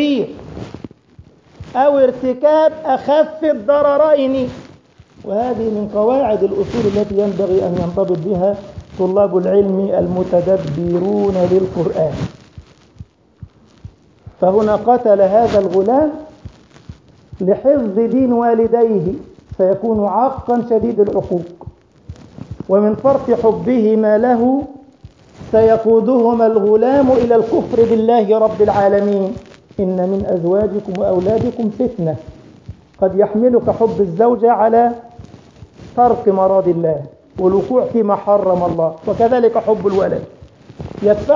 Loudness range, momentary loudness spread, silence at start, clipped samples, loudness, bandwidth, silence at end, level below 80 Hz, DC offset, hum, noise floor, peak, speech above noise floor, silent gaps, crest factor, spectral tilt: 4 LU; 10 LU; 0 s; under 0.1%; -15 LUFS; 7.4 kHz; 0 s; -42 dBFS; under 0.1%; none; -45 dBFS; -2 dBFS; 31 dB; none; 14 dB; -8.5 dB/octave